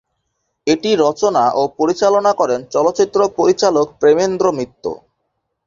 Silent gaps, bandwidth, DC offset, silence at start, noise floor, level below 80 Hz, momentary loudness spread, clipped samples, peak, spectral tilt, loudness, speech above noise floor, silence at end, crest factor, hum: none; 7.6 kHz; under 0.1%; 0.65 s; -72 dBFS; -56 dBFS; 10 LU; under 0.1%; -2 dBFS; -4.5 dB/octave; -15 LUFS; 57 dB; 0.7 s; 14 dB; none